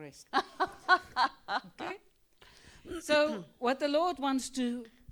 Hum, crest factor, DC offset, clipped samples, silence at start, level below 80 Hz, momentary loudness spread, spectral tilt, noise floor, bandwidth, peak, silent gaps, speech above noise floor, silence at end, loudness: none; 20 dB; under 0.1%; under 0.1%; 0 s; -64 dBFS; 14 LU; -3 dB/octave; -63 dBFS; over 20 kHz; -12 dBFS; none; 31 dB; 0 s; -32 LUFS